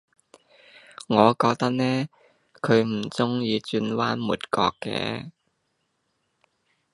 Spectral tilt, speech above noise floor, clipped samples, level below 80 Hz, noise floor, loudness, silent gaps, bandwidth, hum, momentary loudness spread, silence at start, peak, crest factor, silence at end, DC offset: -6 dB/octave; 51 dB; under 0.1%; -62 dBFS; -74 dBFS; -24 LUFS; none; 11.5 kHz; none; 12 LU; 1.1 s; -2 dBFS; 24 dB; 1.65 s; under 0.1%